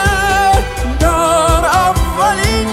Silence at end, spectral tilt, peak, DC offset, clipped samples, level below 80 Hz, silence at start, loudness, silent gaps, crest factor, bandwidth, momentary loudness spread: 0 s; -4 dB/octave; 0 dBFS; under 0.1%; under 0.1%; -20 dBFS; 0 s; -12 LUFS; none; 12 dB; 16.5 kHz; 3 LU